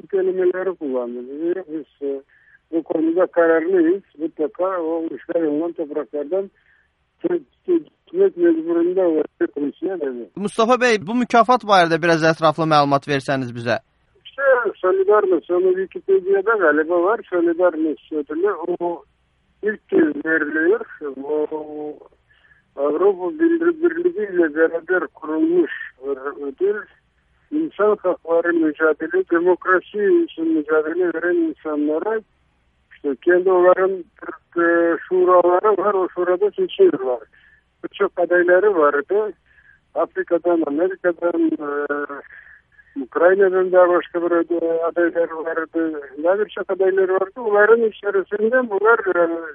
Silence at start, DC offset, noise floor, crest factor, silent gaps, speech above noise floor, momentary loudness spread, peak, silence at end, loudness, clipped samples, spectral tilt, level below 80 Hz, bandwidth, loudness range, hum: 0.1 s; under 0.1%; -63 dBFS; 18 dB; none; 44 dB; 12 LU; -2 dBFS; 0 s; -19 LUFS; under 0.1%; -6.5 dB/octave; -64 dBFS; 10.5 kHz; 5 LU; none